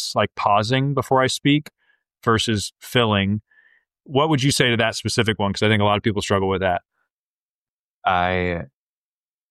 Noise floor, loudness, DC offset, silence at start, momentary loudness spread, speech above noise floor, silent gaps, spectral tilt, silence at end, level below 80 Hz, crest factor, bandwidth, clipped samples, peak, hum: under -90 dBFS; -20 LUFS; under 0.1%; 0 s; 8 LU; over 70 dB; 7.11-8.02 s; -4.5 dB/octave; 0.85 s; -50 dBFS; 16 dB; 14 kHz; under 0.1%; -4 dBFS; none